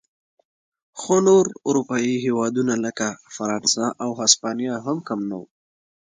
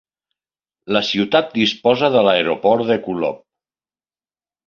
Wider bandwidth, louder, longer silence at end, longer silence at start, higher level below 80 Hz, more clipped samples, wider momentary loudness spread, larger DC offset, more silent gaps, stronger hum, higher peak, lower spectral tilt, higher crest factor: first, 9.6 kHz vs 7.2 kHz; second, -21 LUFS vs -17 LUFS; second, 0.7 s vs 1.3 s; about the same, 0.95 s vs 0.85 s; second, -68 dBFS vs -60 dBFS; neither; first, 11 LU vs 8 LU; neither; neither; neither; about the same, 0 dBFS vs -2 dBFS; second, -3.5 dB/octave vs -5.5 dB/octave; about the same, 22 dB vs 18 dB